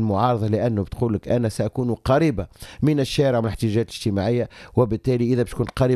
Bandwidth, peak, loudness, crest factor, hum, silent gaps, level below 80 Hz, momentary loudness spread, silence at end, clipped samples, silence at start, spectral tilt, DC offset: 13.5 kHz; -4 dBFS; -22 LUFS; 16 dB; none; none; -42 dBFS; 5 LU; 0 s; under 0.1%; 0 s; -7.5 dB/octave; under 0.1%